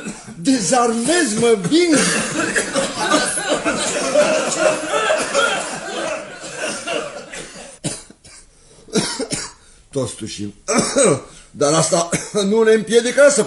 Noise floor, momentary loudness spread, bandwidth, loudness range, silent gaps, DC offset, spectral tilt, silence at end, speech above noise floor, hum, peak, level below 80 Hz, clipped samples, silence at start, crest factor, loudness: -46 dBFS; 14 LU; 11.5 kHz; 10 LU; none; under 0.1%; -3 dB/octave; 0 s; 30 dB; none; 0 dBFS; -50 dBFS; under 0.1%; 0 s; 18 dB; -18 LUFS